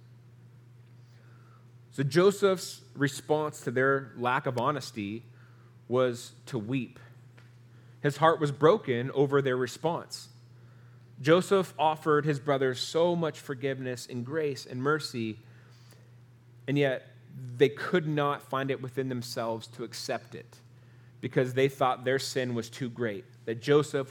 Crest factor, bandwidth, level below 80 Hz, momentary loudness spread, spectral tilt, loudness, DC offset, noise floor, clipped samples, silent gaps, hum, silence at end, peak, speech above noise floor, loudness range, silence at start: 22 dB; 18 kHz; -78 dBFS; 13 LU; -5.5 dB/octave; -29 LUFS; under 0.1%; -55 dBFS; under 0.1%; none; none; 0 s; -8 dBFS; 26 dB; 6 LU; 0.1 s